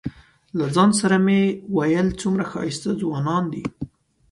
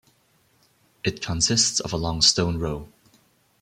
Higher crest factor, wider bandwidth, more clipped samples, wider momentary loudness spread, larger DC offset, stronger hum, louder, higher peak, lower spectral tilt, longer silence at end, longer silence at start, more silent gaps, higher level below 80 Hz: second, 16 dB vs 22 dB; second, 11.5 kHz vs 15.5 kHz; neither; about the same, 14 LU vs 12 LU; neither; neither; about the same, -21 LUFS vs -22 LUFS; about the same, -4 dBFS vs -4 dBFS; first, -6 dB/octave vs -2.5 dB/octave; second, 0.45 s vs 0.75 s; second, 0.05 s vs 1.05 s; neither; second, -50 dBFS vs -44 dBFS